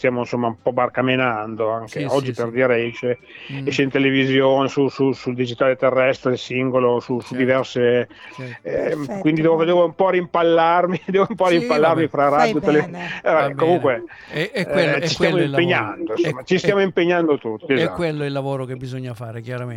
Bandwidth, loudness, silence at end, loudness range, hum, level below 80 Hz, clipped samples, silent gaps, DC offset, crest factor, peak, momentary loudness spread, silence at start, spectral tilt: 11.5 kHz; -19 LUFS; 0 s; 4 LU; none; -56 dBFS; under 0.1%; none; under 0.1%; 16 dB; -4 dBFS; 10 LU; 0 s; -6.5 dB/octave